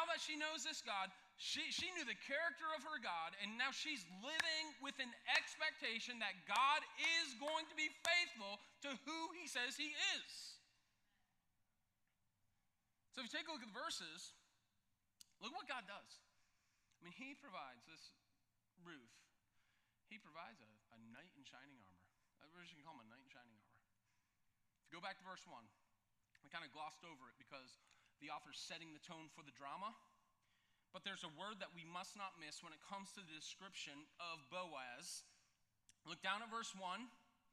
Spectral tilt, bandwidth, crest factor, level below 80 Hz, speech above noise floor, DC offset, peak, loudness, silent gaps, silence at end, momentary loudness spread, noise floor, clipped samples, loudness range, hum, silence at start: -1 dB/octave; 14.5 kHz; 32 dB; under -90 dBFS; 39 dB; under 0.1%; -18 dBFS; -46 LUFS; none; 0.35 s; 22 LU; -87 dBFS; under 0.1%; 22 LU; none; 0 s